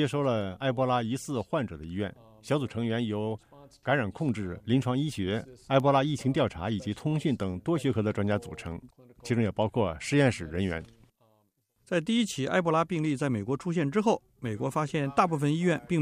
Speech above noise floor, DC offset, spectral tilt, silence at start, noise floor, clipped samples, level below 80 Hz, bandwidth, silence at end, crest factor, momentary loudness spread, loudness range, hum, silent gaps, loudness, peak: 43 dB; under 0.1%; -6.5 dB/octave; 0 s; -71 dBFS; under 0.1%; -56 dBFS; 15 kHz; 0 s; 18 dB; 9 LU; 3 LU; none; none; -29 LUFS; -10 dBFS